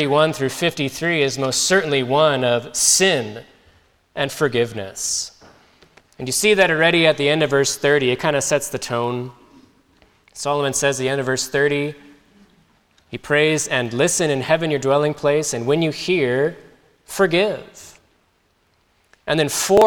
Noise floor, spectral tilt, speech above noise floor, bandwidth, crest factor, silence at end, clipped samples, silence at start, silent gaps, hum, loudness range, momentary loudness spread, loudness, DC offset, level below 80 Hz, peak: -62 dBFS; -3 dB/octave; 44 dB; 19.5 kHz; 18 dB; 0 s; under 0.1%; 0 s; none; none; 5 LU; 11 LU; -18 LUFS; under 0.1%; -54 dBFS; -2 dBFS